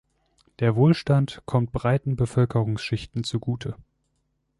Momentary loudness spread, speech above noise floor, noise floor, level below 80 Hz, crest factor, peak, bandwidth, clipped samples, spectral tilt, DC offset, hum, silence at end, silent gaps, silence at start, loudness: 10 LU; 50 dB; -73 dBFS; -48 dBFS; 18 dB; -8 dBFS; 11.5 kHz; under 0.1%; -7.5 dB/octave; under 0.1%; none; 0.85 s; none; 0.6 s; -24 LUFS